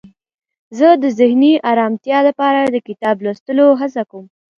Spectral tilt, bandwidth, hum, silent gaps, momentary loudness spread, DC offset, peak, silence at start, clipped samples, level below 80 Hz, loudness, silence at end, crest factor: -6 dB/octave; 7.2 kHz; none; 3.40-3.46 s; 9 LU; under 0.1%; 0 dBFS; 0.7 s; under 0.1%; -66 dBFS; -14 LUFS; 0.35 s; 14 dB